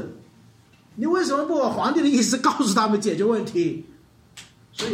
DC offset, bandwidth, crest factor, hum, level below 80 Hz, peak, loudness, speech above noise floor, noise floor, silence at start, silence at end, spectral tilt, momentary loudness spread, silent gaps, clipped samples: under 0.1%; 16 kHz; 18 dB; none; -64 dBFS; -6 dBFS; -22 LUFS; 32 dB; -53 dBFS; 0 s; 0 s; -4 dB/octave; 15 LU; none; under 0.1%